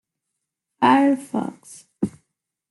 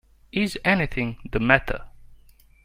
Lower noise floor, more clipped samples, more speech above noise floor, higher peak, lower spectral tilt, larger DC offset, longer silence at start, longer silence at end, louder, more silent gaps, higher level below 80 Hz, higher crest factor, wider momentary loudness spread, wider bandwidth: first, -81 dBFS vs -53 dBFS; neither; first, 61 dB vs 30 dB; second, -4 dBFS vs 0 dBFS; about the same, -5.5 dB/octave vs -6 dB/octave; neither; first, 0.8 s vs 0.35 s; about the same, 0.6 s vs 0.5 s; about the same, -21 LUFS vs -23 LUFS; neither; second, -66 dBFS vs -40 dBFS; about the same, 20 dB vs 24 dB; about the same, 13 LU vs 12 LU; second, 12 kHz vs 16 kHz